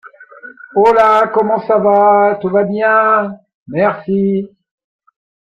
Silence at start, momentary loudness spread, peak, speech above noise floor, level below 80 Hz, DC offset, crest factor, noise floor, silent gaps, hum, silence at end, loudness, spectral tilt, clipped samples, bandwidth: 0.2 s; 10 LU; 0 dBFS; 25 dB; -56 dBFS; under 0.1%; 12 dB; -37 dBFS; 3.54-3.66 s; none; 0.95 s; -12 LUFS; -8 dB/octave; under 0.1%; 7.8 kHz